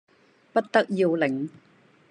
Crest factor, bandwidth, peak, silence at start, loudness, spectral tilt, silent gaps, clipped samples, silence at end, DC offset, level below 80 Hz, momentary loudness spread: 20 dB; 10 kHz; -6 dBFS; 0.55 s; -25 LUFS; -6.5 dB/octave; none; under 0.1%; 0.6 s; under 0.1%; -82 dBFS; 9 LU